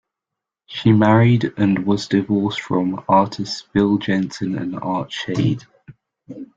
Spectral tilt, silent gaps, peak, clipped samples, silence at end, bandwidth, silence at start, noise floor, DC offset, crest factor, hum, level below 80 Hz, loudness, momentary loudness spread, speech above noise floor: -7 dB/octave; none; -2 dBFS; under 0.1%; 0.1 s; 7.8 kHz; 0.7 s; -84 dBFS; under 0.1%; 18 dB; none; -54 dBFS; -19 LUFS; 10 LU; 66 dB